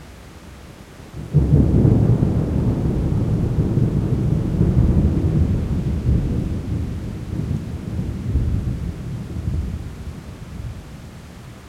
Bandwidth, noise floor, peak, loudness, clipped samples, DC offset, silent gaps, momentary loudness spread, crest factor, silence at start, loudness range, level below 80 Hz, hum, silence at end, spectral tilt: 12 kHz; -39 dBFS; -2 dBFS; -20 LUFS; under 0.1%; under 0.1%; none; 22 LU; 18 dB; 0 s; 8 LU; -28 dBFS; none; 0 s; -9.5 dB/octave